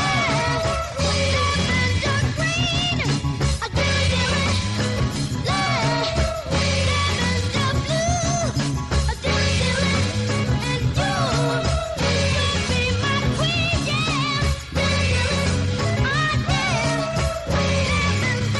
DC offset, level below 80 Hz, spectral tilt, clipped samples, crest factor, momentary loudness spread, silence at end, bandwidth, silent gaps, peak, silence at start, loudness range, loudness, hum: under 0.1%; -32 dBFS; -4.5 dB/octave; under 0.1%; 12 dB; 3 LU; 0 s; 12 kHz; none; -8 dBFS; 0 s; 1 LU; -21 LUFS; none